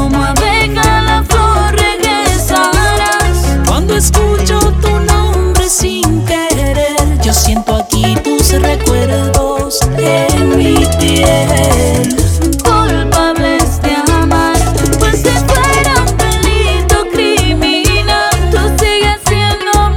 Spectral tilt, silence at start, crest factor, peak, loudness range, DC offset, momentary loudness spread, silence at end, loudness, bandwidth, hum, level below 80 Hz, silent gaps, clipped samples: -4.5 dB/octave; 0 s; 10 dB; 0 dBFS; 1 LU; under 0.1%; 2 LU; 0 s; -10 LUFS; 18 kHz; none; -16 dBFS; none; 0.1%